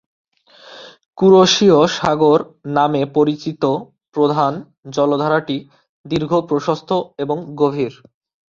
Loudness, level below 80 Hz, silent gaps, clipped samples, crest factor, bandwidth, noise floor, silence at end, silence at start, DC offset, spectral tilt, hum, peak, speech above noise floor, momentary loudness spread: -16 LUFS; -56 dBFS; 1.06-1.11 s, 4.78-4.83 s, 5.89-6.04 s; under 0.1%; 16 dB; 7.4 kHz; -44 dBFS; 0.55 s; 0.7 s; under 0.1%; -5.5 dB/octave; none; -2 dBFS; 28 dB; 14 LU